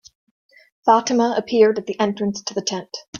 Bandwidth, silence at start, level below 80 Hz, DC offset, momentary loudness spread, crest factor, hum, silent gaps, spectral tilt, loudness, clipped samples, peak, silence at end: 7.2 kHz; 0.85 s; -66 dBFS; under 0.1%; 9 LU; 18 dB; none; 3.08-3.13 s; -4 dB/octave; -19 LUFS; under 0.1%; -2 dBFS; 0 s